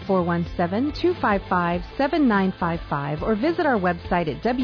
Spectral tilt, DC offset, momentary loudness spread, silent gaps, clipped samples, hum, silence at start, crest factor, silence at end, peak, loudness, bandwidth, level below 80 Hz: -8.5 dB/octave; under 0.1%; 5 LU; none; under 0.1%; none; 0 s; 12 dB; 0 s; -10 dBFS; -23 LUFS; 5.4 kHz; -40 dBFS